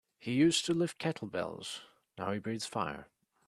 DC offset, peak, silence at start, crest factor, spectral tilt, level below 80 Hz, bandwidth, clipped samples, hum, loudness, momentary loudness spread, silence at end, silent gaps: under 0.1%; -16 dBFS; 0.2 s; 18 dB; -4.5 dB/octave; -70 dBFS; 13 kHz; under 0.1%; none; -34 LUFS; 15 LU; 0.45 s; none